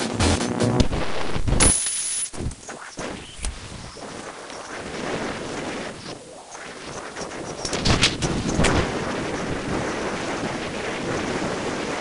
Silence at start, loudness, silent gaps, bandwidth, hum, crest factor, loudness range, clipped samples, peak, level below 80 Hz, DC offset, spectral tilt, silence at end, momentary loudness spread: 0 s; -24 LUFS; none; 11.5 kHz; none; 22 dB; 9 LU; under 0.1%; -2 dBFS; -34 dBFS; under 0.1%; -3.5 dB/octave; 0 s; 16 LU